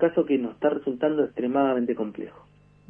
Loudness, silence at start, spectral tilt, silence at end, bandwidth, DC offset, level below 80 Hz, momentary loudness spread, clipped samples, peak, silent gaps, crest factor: -25 LUFS; 0 s; -9.5 dB/octave; 0.6 s; 3.5 kHz; under 0.1%; -66 dBFS; 10 LU; under 0.1%; -8 dBFS; none; 18 dB